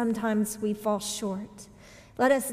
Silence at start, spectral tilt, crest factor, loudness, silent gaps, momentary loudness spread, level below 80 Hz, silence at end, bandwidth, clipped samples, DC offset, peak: 0 s; -4.5 dB/octave; 18 dB; -28 LUFS; none; 21 LU; -62 dBFS; 0 s; 16 kHz; under 0.1%; under 0.1%; -12 dBFS